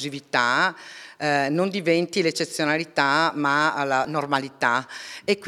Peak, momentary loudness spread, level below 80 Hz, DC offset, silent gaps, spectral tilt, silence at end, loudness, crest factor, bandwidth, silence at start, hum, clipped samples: -4 dBFS; 6 LU; -74 dBFS; under 0.1%; none; -4 dB/octave; 0 s; -23 LUFS; 20 dB; 15.5 kHz; 0 s; none; under 0.1%